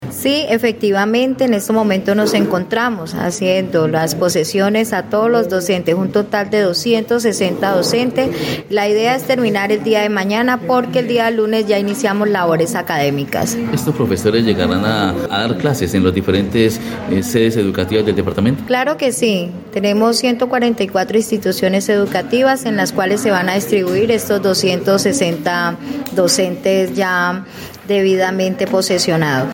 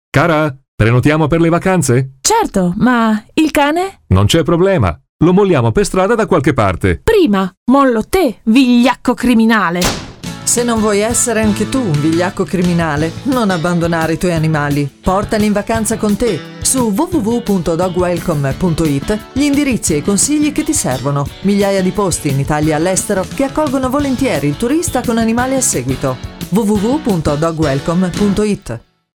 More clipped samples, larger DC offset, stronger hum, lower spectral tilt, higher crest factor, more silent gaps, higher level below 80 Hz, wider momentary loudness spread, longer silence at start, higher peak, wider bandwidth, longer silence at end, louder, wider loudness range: neither; neither; neither; about the same, -4.5 dB/octave vs -5 dB/octave; about the same, 14 dB vs 14 dB; second, none vs 0.68-0.78 s, 5.09-5.19 s, 7.57-7.66 s; second, -52 dBFS vs -34 dBFS; about the same, 4 LU vs 5 LU; second, 0 s vs 0.15 s; about the same, -2 dBFS vs 0 dBFS; second, 17 kHz vs 20 kHz; second, 0 s vs 0.35 s; about the same, -15 LUFS vs -13 LUFS; about the same, 1 LU vs 3 LU